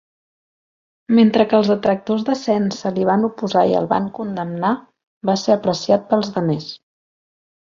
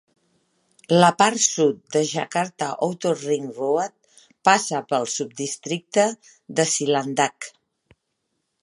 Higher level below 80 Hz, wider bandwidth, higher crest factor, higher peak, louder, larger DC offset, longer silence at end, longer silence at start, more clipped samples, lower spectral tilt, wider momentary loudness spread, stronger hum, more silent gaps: first, -60 dBFS vs -74 dBFS; second, 7.4 kHz vs 11.5 kHz; about the same, 18 dB vs 22 dB; about the same, -2 dBFS vs 0 dBFS; first, -18 LUFS vs -22 LUFS; neither; second, 0.9 s vs 1.15 s; first, 1.1 s vs 0.9 s; neither; first, -6.5 dB/octave vs -3.5 dB/octave; about the same, 11 LU vs 11 LU; neither; first, 5.07-5.21 s vs none